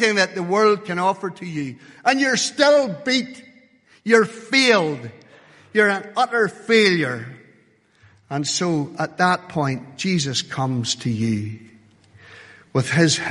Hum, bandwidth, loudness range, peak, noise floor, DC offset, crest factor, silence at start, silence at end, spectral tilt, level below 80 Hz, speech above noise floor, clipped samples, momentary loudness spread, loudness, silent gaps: none; 11.5 kHz; 5 LU; -2 dBFS; -57 dBFS; under 0.1%; 20 dB; 0 s; 0 s; -4 dB/octave; -62 dBFS; 37 dB; under 0.1%; 13 LU; -20 LUFS; none